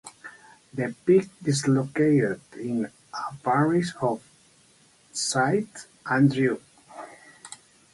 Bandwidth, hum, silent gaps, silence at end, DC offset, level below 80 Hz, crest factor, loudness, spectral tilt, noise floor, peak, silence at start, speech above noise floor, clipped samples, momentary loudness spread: 11.5 kHz; none; none; 0.4 s; under 0.1%; -66 dBFS; 18 dB; -25 LUFS; -5.5 dB/octave; -59 dBFS; -8 dBFS; 0.05 s; 35 dB; under 0.1%; 22 LU